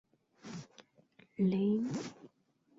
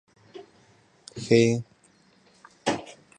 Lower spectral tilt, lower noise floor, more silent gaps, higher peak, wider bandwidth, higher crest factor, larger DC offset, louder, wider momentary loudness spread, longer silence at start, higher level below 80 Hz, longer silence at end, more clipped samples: first, -7.5 dB/octave vs -5.5 dB/octave; first, -72 dBFS vs -61 dBFS; neither; second, -22 dBFS vs -6 dBFS; second, 7.8 kHz vs 10 kHz; second, 16 dB vs 22 dB; neither; second, -34 LUFS vs -25 LUFS; second, 21 LU vs 27 LU; about the same, 0.45 s vs 0.35 s; second, -76 dBFS vs -64 dBFS; first, 0.5 s vs 0.3 s; neither